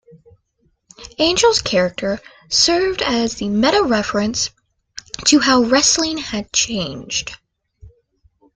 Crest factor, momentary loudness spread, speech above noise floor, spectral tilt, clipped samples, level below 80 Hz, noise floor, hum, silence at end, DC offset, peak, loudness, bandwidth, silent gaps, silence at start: 18 dB; 11 LU; 47 dB; -2.5 dB/octave; under 0.1%; -46 dBFS; -64 dBFS; none; 0.7 s; under 0.1%; 0 dBFS; -16 LUFS; 11 kHz; none; 1 s